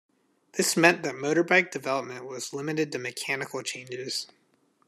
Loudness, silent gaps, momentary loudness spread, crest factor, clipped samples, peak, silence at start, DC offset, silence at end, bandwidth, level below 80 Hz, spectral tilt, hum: -27 LUFS; none; 15 LU; 26 dB; under 0.1%; -2 dBFS; 0.55 s; under 0.1%; 0.6 s; 14 kHz; -78 dBFS; -3.5 dB/octave; none